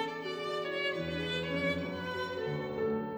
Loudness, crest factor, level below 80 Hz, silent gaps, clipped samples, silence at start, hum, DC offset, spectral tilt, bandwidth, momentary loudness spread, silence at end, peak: -35 LUFS; 16 dB; -60 dBFS; none; under 0.1%; 0 s; none; under 0.1%; -6 dB/octave; over 20 kHz; 4 LU; 0 s; -20 dBFS